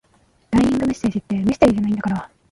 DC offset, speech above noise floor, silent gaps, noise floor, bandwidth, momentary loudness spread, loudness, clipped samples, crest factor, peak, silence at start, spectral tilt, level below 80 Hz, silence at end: under 0.1%; 40 dB; none; -58 dBFS; 11.5 kHz; 7 LU; -19 LUFS; under 0.1%; 18 dB; -2 dBFS; 0.5 s; -7 dB/octave; -42 dBFS; 0.25 s